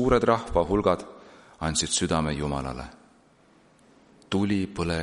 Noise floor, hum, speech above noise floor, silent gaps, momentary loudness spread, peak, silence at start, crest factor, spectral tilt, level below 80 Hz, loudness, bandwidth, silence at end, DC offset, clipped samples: -59 dBFS; none; 34 dB; none; 12 LU; -6 dBFS; 0 s; 20 dB; -4.5 dB/octave; -42 dBFS; -26 LUFS; 11.5 kHz; 0 s; under 0.1%; under 0.1%